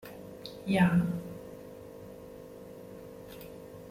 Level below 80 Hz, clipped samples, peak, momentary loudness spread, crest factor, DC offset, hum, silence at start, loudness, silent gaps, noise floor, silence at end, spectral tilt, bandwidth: -60 dBFS; under 0.1%; -14 dBFS; 22 LU; 22 dB; under 0.1%; none; 0.05 s; -29 LUFS; none; -47 dBFS; 0 s; -7.5 dB/octave; 15.5 kHz